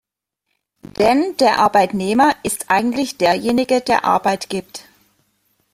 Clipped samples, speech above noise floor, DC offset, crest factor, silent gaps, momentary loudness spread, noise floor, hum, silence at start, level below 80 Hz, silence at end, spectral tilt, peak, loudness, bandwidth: under 0.1%; 60 dB; under 0.1%; 16 dB; none; 11 LU; -76 dBFS; none; 1 s; -54 dBFS; 0.95 s; -4 dB/octave; -2 dBFS; -17 LUFS; 16 kHz